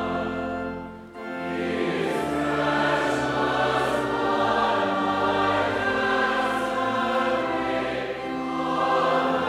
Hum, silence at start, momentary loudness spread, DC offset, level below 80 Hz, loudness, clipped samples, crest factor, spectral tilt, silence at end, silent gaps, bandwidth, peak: none; 0 s; 8 LU; under 0.1%; -52 dBFS; -24 LUFS; under 0.1%; 14 dB; -5 dB/octave; 0 s; none; 15.5 kHz; -10 dBFS